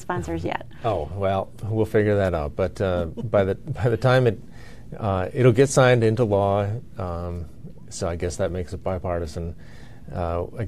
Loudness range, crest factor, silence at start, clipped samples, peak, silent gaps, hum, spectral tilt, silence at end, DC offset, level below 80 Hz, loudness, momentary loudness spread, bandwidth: 9 LU; 18 dB; 0 s; under 0.1%; -6 dBFS; none; none; -6.5 dB/octave; 0 s; 0.9%; -44 dBFS; -23 LUFS; 16 LU; 14 kHz